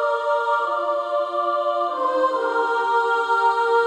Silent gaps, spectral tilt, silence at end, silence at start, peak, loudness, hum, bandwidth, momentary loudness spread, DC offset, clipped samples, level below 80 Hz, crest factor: none; -2 dB/octave; 0 s; 0 s; -8 dBFS; -21 LUFS; none; 10.5 kHz; 4 LU; under 0.1%; under 0.1%; -72 dBFS; 12 dB